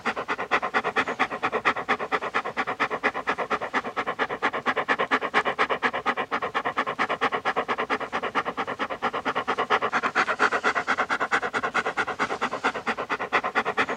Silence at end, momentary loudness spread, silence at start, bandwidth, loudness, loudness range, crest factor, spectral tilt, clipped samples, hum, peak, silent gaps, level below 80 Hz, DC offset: 0 s; 5 LU; 0 s; 14 kHz; -26 LUFS; 2 LU; 20 dB; -3.5 dB/octave; under 0.1%; none; -8 dBFS; none; -64 dBFS; under 0.1%